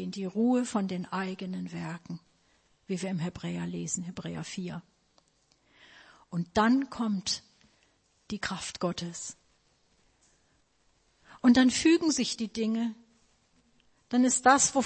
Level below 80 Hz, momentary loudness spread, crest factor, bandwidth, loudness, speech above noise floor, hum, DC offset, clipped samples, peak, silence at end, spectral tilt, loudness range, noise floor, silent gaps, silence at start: -64 dBFS; 17 LU; 24 dB; 8.8 kHz; -29 LUFS; 41 dB; none; under 0.1%; under 0.1%; -8 dBFS; 0 s; -4 dB/octave; 11 LU; -69 dBFS; none; 0 s